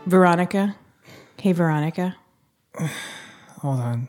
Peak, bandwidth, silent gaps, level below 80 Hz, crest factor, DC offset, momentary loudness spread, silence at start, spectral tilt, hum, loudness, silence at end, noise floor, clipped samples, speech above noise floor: -4 dBFS; 17 kHz; none; -70 dBFS; 20 dB; under 0.1%; 23 LU; 0 s; -7 dB/octave; none; -23 LUFS; 0 s; -64 dBFS; under 0.1%; 44 dB